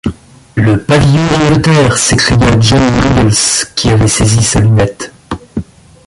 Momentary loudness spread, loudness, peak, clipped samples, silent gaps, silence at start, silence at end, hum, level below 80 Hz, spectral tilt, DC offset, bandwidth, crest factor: 13 LU; -9 LUFS; 0 dBFS; under 0.1%; none; 0.05 s; 0.45 s; none; -26 dBFS; -4.5 dB/octave; under 0.1%; 11.5 kHz; 10 dB